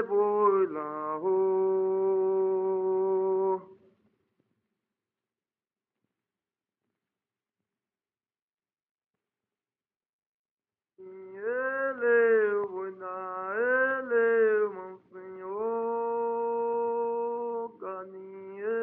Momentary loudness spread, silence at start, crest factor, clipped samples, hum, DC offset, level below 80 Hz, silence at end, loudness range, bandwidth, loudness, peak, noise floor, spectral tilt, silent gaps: 15 LU; 0 s; 16 dB; under 0.1%; none; under 0.1%; -86 dBFS; 0 s; 8 LU; 3.1 kHz; -28 LUFS; -14 dBFS; under -90 dBFS; -5.5 dB/octave; 8.42-8.48 s, 8.91-8.95 s, 10.09-10.19 s, 10.26-10.45 s, 10.51-10.57 s